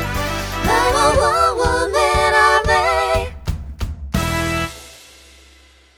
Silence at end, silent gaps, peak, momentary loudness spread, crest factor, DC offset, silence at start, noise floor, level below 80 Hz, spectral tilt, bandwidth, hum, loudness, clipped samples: 1 s; none; -2 dBFS; 15 LU; 16 dB; under 0.1%; 0 s; -49 dBFS; -30 dBFS; -4 dB/octave; over 20 kHz; none; -16 LUFS; under 0.1%